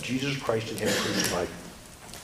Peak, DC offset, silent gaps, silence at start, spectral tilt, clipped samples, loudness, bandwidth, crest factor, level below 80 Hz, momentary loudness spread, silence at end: -8 dBFS; under 0.1%; none; 0 s; -3.5 dB/octave; under 0.1%; -28 LUFS; 16 kHz; 22 dB; -54 dBFS; 18 LU; 0 s